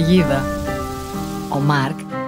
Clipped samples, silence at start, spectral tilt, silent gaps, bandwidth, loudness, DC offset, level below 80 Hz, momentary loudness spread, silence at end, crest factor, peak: under 0.1%; 0 s; -6.5 dB/octave; none; 16 kHz; -20 LUFS; under 0.1%; -36 dBFS; 11 LU; 0 s; 16 dB; -4 dBFS